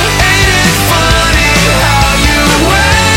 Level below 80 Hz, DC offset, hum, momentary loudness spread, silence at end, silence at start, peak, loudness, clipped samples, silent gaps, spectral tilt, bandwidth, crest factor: -16 dBFS; under 0.1%; none; 1 LU; 0 s; 0 s; 0 dBFS; -7 LUFS; 0.2%; none; -3.5 dB/octave; 17.5 kHz; 8 dB